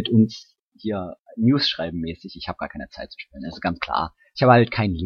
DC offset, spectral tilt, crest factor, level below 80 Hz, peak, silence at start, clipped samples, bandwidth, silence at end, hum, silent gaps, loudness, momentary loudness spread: under 0.1%; -7.5 dB/octave; 22 dB; -48 dBFS; 0 dBFS; 0 s; under 0.1%; 6.6 kHz; 0 s; none; 0.59-0.72 s, 1.19-1.25 s; -22 LUFS; 19 LU